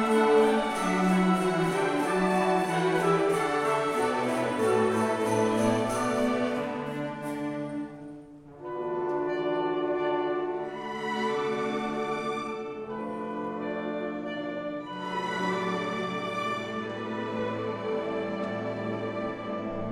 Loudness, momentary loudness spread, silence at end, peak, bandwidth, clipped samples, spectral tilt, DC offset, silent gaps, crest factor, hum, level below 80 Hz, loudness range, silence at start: -29 LUFS; 10 LU; 0 s; -12 dBFS; 16 kHz; under 0.1%; -5.5 dB/octave; under 0.1%; none; 16 dB; none; -60 dBFS; 7 LU; 0 s